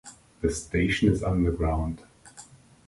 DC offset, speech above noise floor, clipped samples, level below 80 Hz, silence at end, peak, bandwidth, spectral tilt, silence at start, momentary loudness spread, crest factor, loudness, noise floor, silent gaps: under 0.1%; 26 dB; under 0.1%; -36 dBFS; 0.45 s; -8 dBFS; 11.5 kHz; -6 dB/octave; 0.05 s; 18 LU; 18 dB; -26 LUFS; -51 dBFS; none